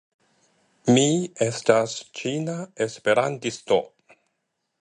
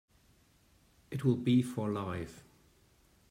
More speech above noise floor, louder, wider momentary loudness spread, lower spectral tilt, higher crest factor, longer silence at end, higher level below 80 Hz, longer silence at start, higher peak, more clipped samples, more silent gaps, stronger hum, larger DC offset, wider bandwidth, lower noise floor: first, 55 dB vs 35 dB; first, -23 LUFS vs -33 LUFS; second, 11 LU vs 14 LU; second, -4.5 dB/octave vs -7.5 dB/octave; about the same, 22 dB vs 20 dB; about the same, 0.95 s vs 0.9 s; about the same, -66 dBFS vs -66 dBFS; second, 0.85 s vs 1.1 s; first, -2 dBFS vs -16 dBFS; neither; neither; neither; neither; second, 11 kHz vs 15.5 kHz; first, -77 dBFS vs -67 dBFS